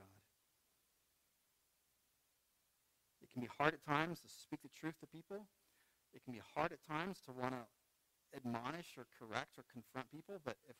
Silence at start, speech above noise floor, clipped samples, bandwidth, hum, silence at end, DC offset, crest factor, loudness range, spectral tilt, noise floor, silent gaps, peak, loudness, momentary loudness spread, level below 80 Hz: 0 s; 35 dB; under 0.1%; 16 kHz; none; 0.05 s; under 0.1%; 32 dB; 4 LU; -5.5 dB/octave; -82 dBFS; none; -16 dBFS; -46 LUFS; 16 LU; -78 dBFS